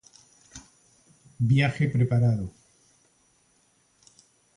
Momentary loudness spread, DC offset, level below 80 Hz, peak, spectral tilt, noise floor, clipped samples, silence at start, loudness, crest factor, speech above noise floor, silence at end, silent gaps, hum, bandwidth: 25 LU; under 0.1%; -54 dBFS; -10 dBFS; -7 dB/octave; -66 dBFS; under 0.1%; 0.55 s; -24 LUFS; 18 dB; 43 dB; 2.1 s; none; none; 10.5 kHz